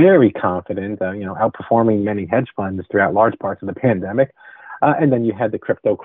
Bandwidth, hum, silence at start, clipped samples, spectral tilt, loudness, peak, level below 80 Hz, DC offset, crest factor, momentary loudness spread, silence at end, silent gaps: 3.9 kHz; none; 0 s; under 0.1%; -7 dB/octave; -18 LUFS; 0 dBFS; -56 dBFS; under 0.1%; 16 dB; 9 LU; 0 s; none